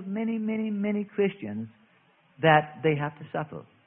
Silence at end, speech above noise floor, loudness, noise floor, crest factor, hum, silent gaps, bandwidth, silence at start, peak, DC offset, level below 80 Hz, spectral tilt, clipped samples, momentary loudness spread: 0.25 s; 36 dB; -27 LUFS; -63 dBFS; 22 dB; none; none; 3.7 kHz; 0 s; -8 dBFS; under 0.1%; -66 dBFS; -11 dB/octave; under 0.1%; 15 LU